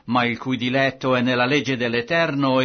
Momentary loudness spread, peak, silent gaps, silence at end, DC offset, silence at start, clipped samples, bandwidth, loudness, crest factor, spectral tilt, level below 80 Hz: 4 LU; -6 dBFS; none; 0 s; under 0.1%; 0.05 s; under 0.1%; 6.6 kHz; -20 LUFS; 14 dB; -5.5 dB/octave; -58 dBFS